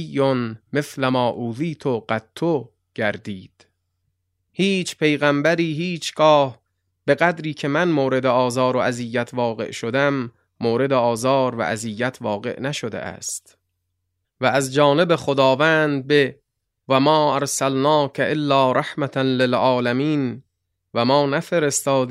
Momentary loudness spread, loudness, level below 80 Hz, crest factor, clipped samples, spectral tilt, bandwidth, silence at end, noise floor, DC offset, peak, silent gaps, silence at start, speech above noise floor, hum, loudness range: 10 LU; -20 LUFS; -64 dBFS; 18 dB; under 0.1%; -5 dB/octave; 16 kHz; 0 s; -75 dBFS; under 0.1%; -2 dBFS; none; 0 s; 56 dB; none; 6 LU